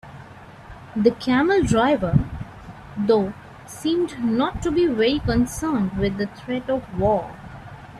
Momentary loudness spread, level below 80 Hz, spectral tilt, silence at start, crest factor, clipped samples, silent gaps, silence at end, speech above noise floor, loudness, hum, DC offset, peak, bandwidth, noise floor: 21 LU; -40 dBFS; -6.5 dB/octave; 0.05 s; 20 dB; under 0.1%; none; 0 s; 22 dB; -22 LUFS; none; under 0.1%; -4 dBFS; 14 kHz; -42 dBFS